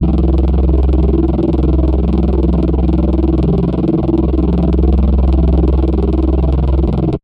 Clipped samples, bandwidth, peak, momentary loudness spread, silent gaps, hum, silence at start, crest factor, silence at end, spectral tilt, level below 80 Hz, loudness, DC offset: under 0.1%; 4.5 kHz; -2 dBFS; 2 LU; none; none; 0 s; 10 dB; 0.05 s; -11.5 dB/octave; -14 dBFS; -14 LUFS; under 0.1%